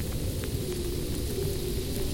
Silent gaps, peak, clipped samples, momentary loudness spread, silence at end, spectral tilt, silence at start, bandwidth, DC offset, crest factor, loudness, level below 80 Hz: none; -18 dBFS; under 0.1%; 1 LU; 0 s; -5 dB/octave; 0 s; 17 kHz; under 0.1%; 12 dB; -32 LUFS; -36 dBFS